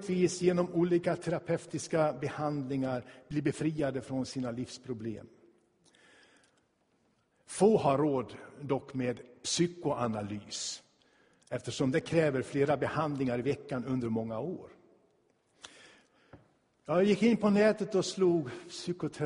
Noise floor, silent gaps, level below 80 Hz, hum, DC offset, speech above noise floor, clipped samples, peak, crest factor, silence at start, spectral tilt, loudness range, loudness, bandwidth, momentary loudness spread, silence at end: -73 dBFS; none; -66 dBFS; none; under 0.1%; 42 dB; under 0.1%; -14 dBFS; 20 dB; 0 s; -5.5 dB/octave; 8 LU; -32 LUFS; 10.5 kHz; 14 LU; 0 s